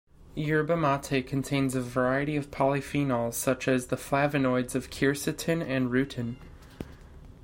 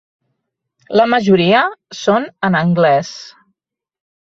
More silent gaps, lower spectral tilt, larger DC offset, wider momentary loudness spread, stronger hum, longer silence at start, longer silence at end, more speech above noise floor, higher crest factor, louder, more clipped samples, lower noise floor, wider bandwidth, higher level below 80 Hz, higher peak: neither; about the same, -5.5 dB/octave vs -6 dB/octave; neither; about the same, 10 LU vs 9 LU; neither; second, 0.2 s vs 0.9 s; second, 0.1 s vs 1.05 s; second, 21 dB vs 63 dB; about the same, 16 dB vs 16 dB; second, -28 LUFS vs -14 LUFS; neither; second, -48 dBFS vs -77 dBFS; first, 16.5 kHz vs 7.6 kHz; first, -52 dBFS vs -58 dBFS; second, -12 dBFS vs -2 dBFS